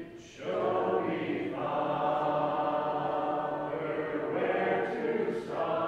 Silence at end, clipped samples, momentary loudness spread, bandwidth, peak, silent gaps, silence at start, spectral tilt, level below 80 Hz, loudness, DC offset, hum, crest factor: 0 s; under 0.1%; 4 LU; 9.6 kHz; -16 dBFS; none; 0 s; -7 dB/octave; -66 dBFS; -31 LUFS; under 0.1%; none; 14 dB